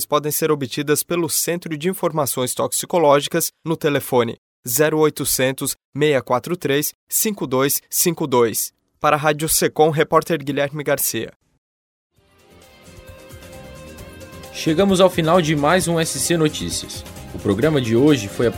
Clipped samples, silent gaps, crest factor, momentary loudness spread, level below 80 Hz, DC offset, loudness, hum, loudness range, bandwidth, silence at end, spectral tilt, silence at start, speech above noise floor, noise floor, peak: under 0.1%; 4.38-4.63 s, 5.85-5.92 s, 6.94-7.07 s, 11.36-11.40 s, 11.58-12.10 s; 20 dB; 12 LU; -48 dBFS; under 0.1%; -19 LUFS; none; 7 LU; over 20 kHz; 0 s; -4 dB/octave; 0 s; 33 dB; -52 dBFS; 0 dBFS